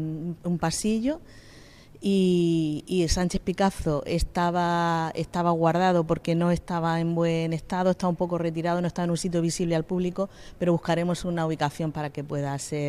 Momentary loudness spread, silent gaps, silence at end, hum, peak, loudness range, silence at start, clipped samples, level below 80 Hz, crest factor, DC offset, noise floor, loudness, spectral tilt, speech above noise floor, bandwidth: 7 LU; none; 0 s; none; -8 dBFS; 2 LU; 0 s; under 0.1%; -42 dBFS; 16 dB; under 0.1%; -49 dBFS; -26 LUFS; -6 dB/octave; 24 dB; 13.5 kHz